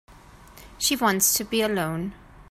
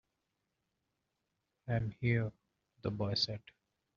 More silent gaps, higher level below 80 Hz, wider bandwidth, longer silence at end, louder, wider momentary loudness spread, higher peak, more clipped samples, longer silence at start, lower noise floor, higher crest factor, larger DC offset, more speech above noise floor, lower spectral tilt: neither; first, -52 dBFS vs -64 dBFS; first, 16 kHz vs 7.2 kHz; second, 0.1 s vs 0.6 s; first, -23 LUFS vs -36 LUFS; about the same, 11 LU vs 11 LU; first, -6 dBFS vs -20 dBFS; neither; second, 0.1 s vs 1.65 s; second, -48 dBFS vs -85 dBFS; about the same, 20 dB vs 20 dB; neither; second, 24 dB vs 50 dB; second, -2.5 dB/octave vs -4.5 dB/octave